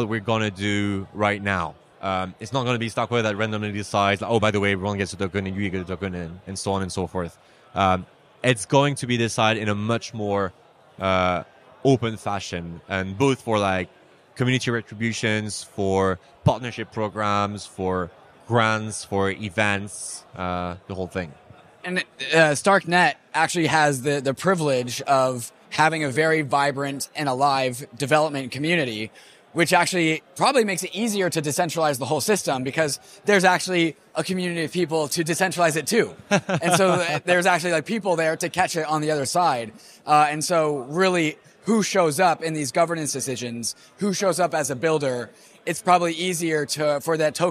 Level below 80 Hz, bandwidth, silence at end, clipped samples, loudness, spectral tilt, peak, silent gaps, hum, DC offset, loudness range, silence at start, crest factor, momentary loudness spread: -58 dBFS; 15.5 kHz; 0 s; under 0.1%; -23 LUFS; -4.5 dB/octave; -4 dBFS; none; none; under 0.1%; 4 LU; 0 s; 18 dB; 10 LU